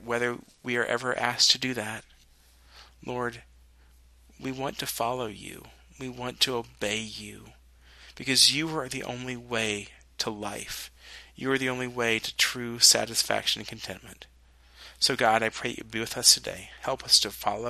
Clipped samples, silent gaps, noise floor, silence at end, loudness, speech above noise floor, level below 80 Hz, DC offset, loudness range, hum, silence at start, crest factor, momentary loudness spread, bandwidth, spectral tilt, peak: under 0.1%; none; -58 dBFS; 0 s; -26 LUFS; 30 dB; -58 dBFS; under 0.1%; 10 LU; none; 0 s; 26 dB; 20 LU; 13.5 kHz; -1.5 dB/octave; -2 dBFS